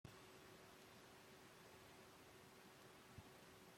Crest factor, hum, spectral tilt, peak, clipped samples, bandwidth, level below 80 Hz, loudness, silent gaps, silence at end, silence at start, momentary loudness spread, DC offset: 20 dB; none; -3.5 dB/octave; -44 dBFS; under 0.1%; 16.5 kHz; -82 dBFS; -64 LUFS; none; 0 s; 0.05 s; 1 LU; under 0.1%